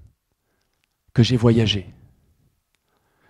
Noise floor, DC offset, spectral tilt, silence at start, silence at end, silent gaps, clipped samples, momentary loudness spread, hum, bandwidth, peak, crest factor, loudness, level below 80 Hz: -71 dBFS; under 0.1%; -6.5 dB/octave; 1.15 s; 1.4 s; none; under 0.1%; 9 LU; none; 10.5 kHz; -2 dBFS; 22 dB; -19 LUFS; -48 dBFS